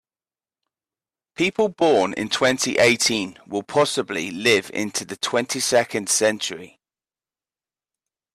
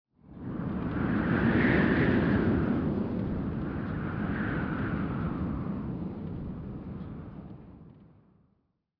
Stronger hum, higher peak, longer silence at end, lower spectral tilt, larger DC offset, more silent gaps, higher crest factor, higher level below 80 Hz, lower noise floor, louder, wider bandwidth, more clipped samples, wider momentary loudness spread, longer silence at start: neither; first, -4 dBFS vs -12 dBFS; first, 1.65 s vs 0.9 s; second, -2.5 dB/octave vs -10 dB/octave; neither; neither; about the same, 18 dB vs 18 dB; second, -64 dBFS vs -44 dBFS; first, under -90 dBFS vs -74 dBFS; first, -21 LUFS vs -30 LUFS; first, 15.5 kHz vs 5.4 kHz; neither; second, 10 LU vs 17 LU; first, 1.4 s vs 0.25 s